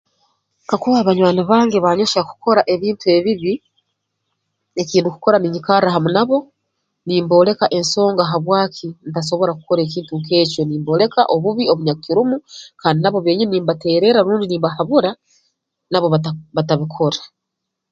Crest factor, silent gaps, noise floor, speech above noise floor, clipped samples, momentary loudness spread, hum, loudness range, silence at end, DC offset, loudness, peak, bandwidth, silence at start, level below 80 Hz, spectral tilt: 16 dB; none; -78 dBFS; 62 dB; under 0.1%; 9 LU; none; 2 LU; 0.65 s; under 0.1%; -16 LUFS; 0 dBFS; 9 kHz; 0.7 s; -60 dBFS; -6 dB/octave